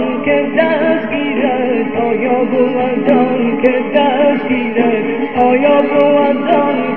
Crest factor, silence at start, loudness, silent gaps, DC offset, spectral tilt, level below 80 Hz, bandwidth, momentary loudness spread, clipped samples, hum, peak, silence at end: 12 dB; 0 s; -13 LUFS; none; 2%; -8.5 dB/octave; -56 dBFS; 4.5 kHz; 5 LU; under 0.1%; none; 0 dBFS; 0 s